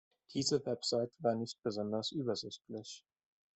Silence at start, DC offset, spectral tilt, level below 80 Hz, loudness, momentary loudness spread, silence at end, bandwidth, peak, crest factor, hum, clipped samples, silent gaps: 0.3 s; under 0.1%; -4.5 dB/octave; -78 dBFS; -37 LUFS; 12 LU; 0.55 s; 8.4 kHz; -18 dBFS; 20 dB; none; under 0.1%; none